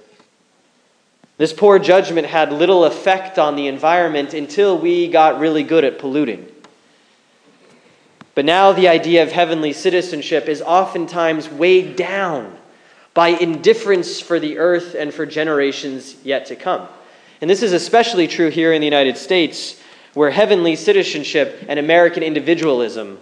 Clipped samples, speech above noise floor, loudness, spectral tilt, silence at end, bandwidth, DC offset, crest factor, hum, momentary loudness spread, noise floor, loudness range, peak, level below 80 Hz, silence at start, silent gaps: under 0.1%; 43 dB; -15 LUFS; -4.5 dB/octave; 0.05 s; 10.5 kHz; under 0.1%; 16 dB; none; 10 LU; -58 dBFS; 4 LU; 0 dBFS; -72 dBFS; 1.4 s; none